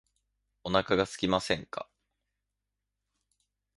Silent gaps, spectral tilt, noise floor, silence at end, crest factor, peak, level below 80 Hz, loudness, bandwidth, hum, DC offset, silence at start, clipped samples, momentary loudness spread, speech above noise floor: none; -4.5 dB/octave; -86 dBFS; 1.95 s; 26 dB; -8 dBFS; -58 dBFS; -29 LUFS; 11.5 kHz; 50 Hz at -65 dBFS; under 0.1%; 0.65 s; under 0.1%; 15 LU; 56 dB